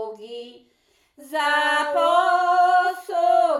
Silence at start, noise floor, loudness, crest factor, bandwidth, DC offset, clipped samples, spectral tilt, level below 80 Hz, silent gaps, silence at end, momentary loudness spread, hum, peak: 0 s; -64 dBFS; -20 LUFS; 14 dB; 13 kHz; under 0.1%; under 0.1%; -0.5 dB/octave; -78 dBFS; none; 0 s; 18 LU; none; -6 dBFS